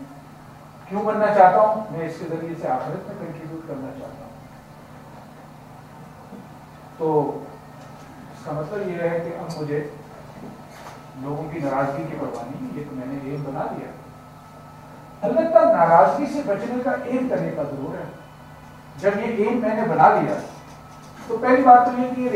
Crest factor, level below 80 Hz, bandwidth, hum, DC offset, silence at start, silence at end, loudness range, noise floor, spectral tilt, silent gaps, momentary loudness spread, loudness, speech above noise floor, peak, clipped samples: 22 dB; -58 dBFS; 15.5 kHz; none; under 0.1%; 0 s; 0 s; 12 LU; -43 dBFS; -7.5 dB/octave; none; 28 LU; -21 LUFS; 22 dB; 0 dBFS; under 0.1%